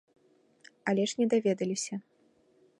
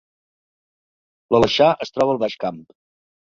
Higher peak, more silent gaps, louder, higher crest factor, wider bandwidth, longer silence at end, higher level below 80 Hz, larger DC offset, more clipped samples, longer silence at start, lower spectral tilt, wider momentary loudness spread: second, -14 dBFS vs -2 dBFS; neither; second, -30 LUFS vs -19 LUFS; about the same, 20 dB vs 20 dB; first, 11.5 kHz vs 7.8 kHz; about the same, 0.8 s vs 0.7 s; second, -80 dBFS vs -54 dBFS; neither; neither; second, 0.85 s vs 1.3 s; about the same, -4.5 dB/octave vs -5.5 dB/octave; about the same, 11 LU vs 11 LU